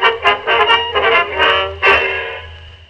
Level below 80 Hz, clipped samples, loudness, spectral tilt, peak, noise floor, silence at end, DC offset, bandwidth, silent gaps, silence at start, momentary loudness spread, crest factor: -40 dBFS; under 0.1%; -12 LUFS; -3.5 dB/octave; 0 dBFS; -34 dBFS; 0.15 s; under 0.1%; 11 kHz; none; 0 s; 9 LU; 14 dB